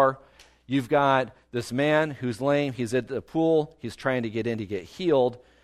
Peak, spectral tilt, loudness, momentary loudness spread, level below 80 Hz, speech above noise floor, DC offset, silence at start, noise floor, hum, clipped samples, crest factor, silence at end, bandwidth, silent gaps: -8 dBFS; -6.5 dB/octave; -26 LUFS; 9 LU; -60 dBFS; 30 dB; under 0.1%; 0 s; -55 dBFS; none; under 0.1%; 18 dB; 0.25 s; 13.5 kHz; none